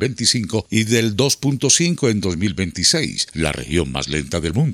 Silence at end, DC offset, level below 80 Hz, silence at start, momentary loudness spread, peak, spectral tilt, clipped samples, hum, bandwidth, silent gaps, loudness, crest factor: 0 s; under 0.1%; -42 dBFS; 0 s; 7 LU; 0 dBFS; -3.5 dB/octave; under 0.1%; none; 16.5 kHz; none; -18 LUFS; 18 dB